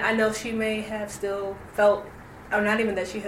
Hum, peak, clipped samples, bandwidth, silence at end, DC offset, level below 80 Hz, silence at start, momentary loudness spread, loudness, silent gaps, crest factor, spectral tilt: none; -8 dBFS; under 0.1%; 16 kHz; 0 s; under 0.1%; -52 dBFS; 0 s; 10 LU; -26 LUFS; none; 18 dB; -4.5 dB/octave